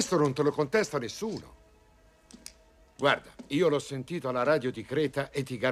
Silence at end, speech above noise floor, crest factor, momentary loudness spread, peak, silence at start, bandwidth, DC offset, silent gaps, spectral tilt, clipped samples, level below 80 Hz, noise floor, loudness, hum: 0 s; 32 dB; 20 dB; 13 LU; -10 dBFS; 0 s; 14.5 kHz; under 0.1%; none; -5 dB/octave; under 0.1%; -62 dBFS; -60 dBFS; -29 LUFS; none